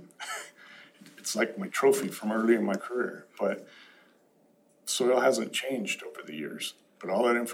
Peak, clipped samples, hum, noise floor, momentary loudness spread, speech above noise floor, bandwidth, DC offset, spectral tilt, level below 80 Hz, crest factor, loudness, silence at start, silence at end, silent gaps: -10 dBFS; under 0.1%; none; -64 dBFS; 14 LU; 36 dB; over 20 kHz; under 0.1%; -3.5 dB/octave; under -90 dBFS; 20 dB; -29 LUFS; 0 s; 0 s; none